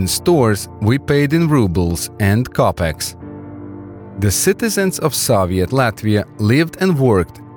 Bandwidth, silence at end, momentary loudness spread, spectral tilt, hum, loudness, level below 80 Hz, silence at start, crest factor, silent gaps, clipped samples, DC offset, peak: 19.5 kHz; 0 s; 18 LU; -5.5 dB/octave; none; -16 LUFS; -38 dBFS; 0 s; 12 dB; none; under 0.1%; under 0.1%; -4 dBFS